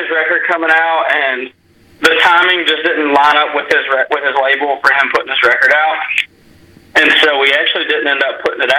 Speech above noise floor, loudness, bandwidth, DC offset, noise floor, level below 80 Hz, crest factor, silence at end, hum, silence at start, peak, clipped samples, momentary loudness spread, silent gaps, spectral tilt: 31 dB; -11 LUFS; 17 kHz; under 0.1%; -43 dBFS; -56 dBFS; 12 dB; 0 s; none; 0 s; 0 dBFS; under 0.1%; 7 LU; none; -2 dB/octave